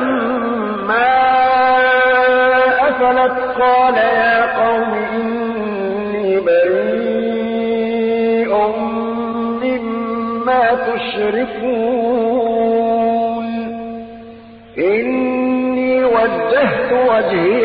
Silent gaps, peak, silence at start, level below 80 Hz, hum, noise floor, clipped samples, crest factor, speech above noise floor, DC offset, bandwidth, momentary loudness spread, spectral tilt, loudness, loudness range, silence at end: none; -4 dBFS; 0 s; -50 dBFS; none; -37 dBFS; under 0.1%; 10 dB; 24 dB; under 0.1%; 5.2 kHz; 8 LU; -10.5 dB/octave; -15 LUFS; 5 LU; 0 s